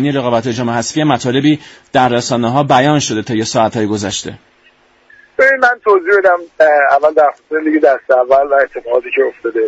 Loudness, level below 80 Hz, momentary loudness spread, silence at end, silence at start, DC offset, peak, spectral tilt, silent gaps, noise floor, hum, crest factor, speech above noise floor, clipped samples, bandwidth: -12 LUFS; -52 dBFS; 7 LU; 0 s; 0 s; under 0.1%; 0 dBFS; -5 dB/octave; none; -50 dBFS; none; 12 dB; 38 dB; under 0.1%; 8 kHz